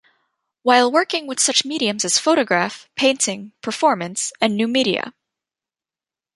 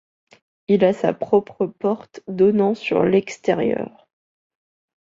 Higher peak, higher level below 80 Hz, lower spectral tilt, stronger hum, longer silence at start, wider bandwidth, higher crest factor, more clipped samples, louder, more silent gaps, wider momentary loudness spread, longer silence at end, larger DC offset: about the same, -2 dBFS vs -2 dBFS; second, -68 dBFS vs -62 dBFS; second, -2 dB/octave vs -7 dB/octave; neither; about the same, 0.65 s vs 0.7 s; first, 11.5 kHz vs 7.6 kHz; about the same, 18 dB vs 18 dB; neither; about the same, -18 LUFS vs -20 LUFS; neither; second, 9 LU vs 12 LU; about the same, 1.25 s vs 1.25 s; neither